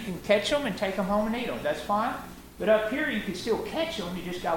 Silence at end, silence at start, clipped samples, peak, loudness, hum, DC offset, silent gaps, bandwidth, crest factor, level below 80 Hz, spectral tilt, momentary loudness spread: 0 s; 0 s; under 0.1%; -8 dBFS; -28 LUFS; none; under 0.1%; none; 17 kHz; 20 dB; -50 dBFS; -5 dB/octave; 8 LU